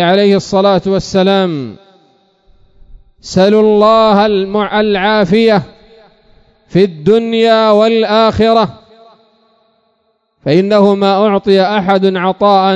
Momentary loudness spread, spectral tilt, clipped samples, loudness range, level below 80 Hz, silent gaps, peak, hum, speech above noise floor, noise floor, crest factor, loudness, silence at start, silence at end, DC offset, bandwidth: 6 LU; -6.5 dB/octave; 0.4%; 3 LU; -44 dBFS; none; 0 dBFS; none; 51 dB; -60 dBFS; 12 dB; -10 LUFS; 0 s; 0 s; under 0.1%; 8 kHz